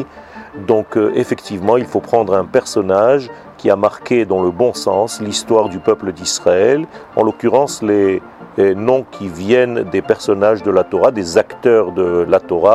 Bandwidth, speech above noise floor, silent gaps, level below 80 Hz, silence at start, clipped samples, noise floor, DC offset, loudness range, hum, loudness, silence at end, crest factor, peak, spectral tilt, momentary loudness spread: 13 kHz; 21 dB; none; -52 dBFS; 0 s; under 0.1%; -35 dBFS; under 0.1%; 1 LU; none; -15 LUFS; 0 s; 14 dB; 0 dBFS; -5 dB/octave; 7 LU